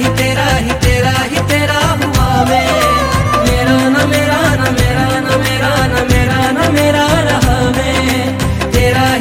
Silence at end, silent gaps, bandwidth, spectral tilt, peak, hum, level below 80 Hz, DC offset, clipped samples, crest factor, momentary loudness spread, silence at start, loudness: 0 s; none; 16.5 kHz; -5 dB/octave; 0 dBFS; none; -22 dBFS; under 0.1%; under 0.1%; 12 dB; 2 LU; 0 s; -12 LUFS